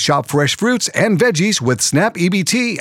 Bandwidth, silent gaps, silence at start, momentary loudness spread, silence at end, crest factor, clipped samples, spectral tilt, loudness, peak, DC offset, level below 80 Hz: 17.5 kHz; none; 0 s; 2 LU; 0 s; 14 dB; under 0.1%; -4 dB/octave; -15 LUFS; -2 dBFS; under 0.1%; -60 dBFS